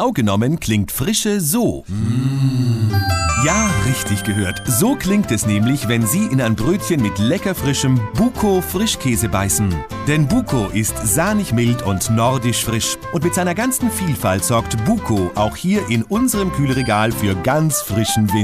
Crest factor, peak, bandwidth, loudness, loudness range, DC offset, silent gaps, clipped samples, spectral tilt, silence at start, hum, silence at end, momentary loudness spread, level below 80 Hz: 14 dB; -4 dBFS; 15.5 kHz; -17 LUFS; 1 LU; under 0.1%; none; under 0.1%; -5 dB/octave; 0 s; none; 0 s; 3 LU; -36 dBFS